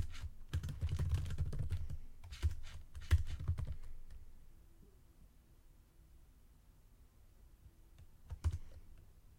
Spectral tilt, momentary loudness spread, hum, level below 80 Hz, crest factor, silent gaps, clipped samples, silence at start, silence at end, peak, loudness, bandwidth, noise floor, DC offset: -6 dB/octave; 27 LU; none; -46 dBFS; 22 dB; none; under 0.1%; 0 s; 0.05 s; -20 dBFS; -43 LUFS; 15.5 kHz; -64 dBFS; under 0.1%